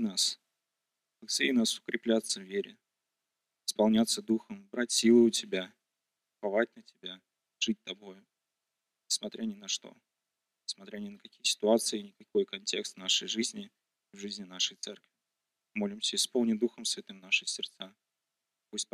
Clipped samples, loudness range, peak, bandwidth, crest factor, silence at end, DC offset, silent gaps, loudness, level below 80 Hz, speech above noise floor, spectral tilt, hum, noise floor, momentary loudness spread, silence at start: under 0.1%; 8 LU; -12 dBFS; 15 kHz; 20 dB; 0.1 s; under 0.1%; none; -31 LUFS; -78 dBFS; 56 dB; -2.5 dB/octave; none; -87 dBFS; 18 LU; 0 s